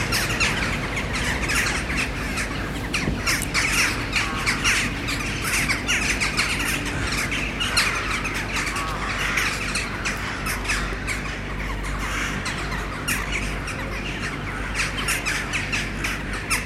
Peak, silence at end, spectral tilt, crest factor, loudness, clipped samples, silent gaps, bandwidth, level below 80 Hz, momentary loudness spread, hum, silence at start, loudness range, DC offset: -6 dBFS; 0 s; -3 dB/octave; 20 dB; -23 LUFS; under 0.1%; none; 16 kHz; -34 dBFS; 8 LU; none; 0 s; 5 LU; under 0.1%